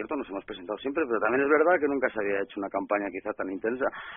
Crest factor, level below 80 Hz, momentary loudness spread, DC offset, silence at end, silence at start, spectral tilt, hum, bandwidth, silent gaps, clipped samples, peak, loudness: 18 dB; -64 dBFS; 11 LU; under 0.1%; 0 s; 0 s; 1 dB/octave; none; 3.8 kHz; none; under 0.1%; -10 dBFS; -28 LUFS